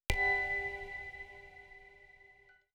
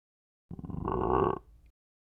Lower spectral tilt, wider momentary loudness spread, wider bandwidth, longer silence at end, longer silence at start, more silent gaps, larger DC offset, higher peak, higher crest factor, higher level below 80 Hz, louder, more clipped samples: second, -3.5 dB/octave vs -10.5 dB/octave; first, 25 LU vs 17 LU; first, over 20 kHz vs 3.5 kHz; second, 0.5 s vs 0.75 s; second, 0.1 s vs 0.5 s; neither; neither; about the same, -14 dBFS vs -14 dBFS; about the same, 24 dB vs 20 dB; about the same, -48 dBFS vs -48 dBFS; about the same, -34 LUFS vs -32 LUFS; neither